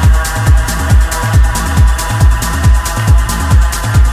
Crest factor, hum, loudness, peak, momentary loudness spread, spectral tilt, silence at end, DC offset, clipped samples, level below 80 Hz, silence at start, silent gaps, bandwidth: 8 dB; none; -11 LUFS; 0 dBFS; 1 LU; -5 dB/octave; 0 s; under 0.1%; under 0.1%; -10 dBFS; 0 s; none; 15.5 kHz